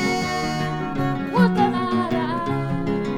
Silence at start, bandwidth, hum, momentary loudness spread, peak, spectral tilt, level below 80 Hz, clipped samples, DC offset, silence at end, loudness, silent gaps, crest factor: 0 s; 15 kHz; none; 6 LU; -6 dBFS; -6.5 dB/octave; -46 dBFS; under 0.1%; under 0.1%; 0 s; -22 LUFS; none; 16 dB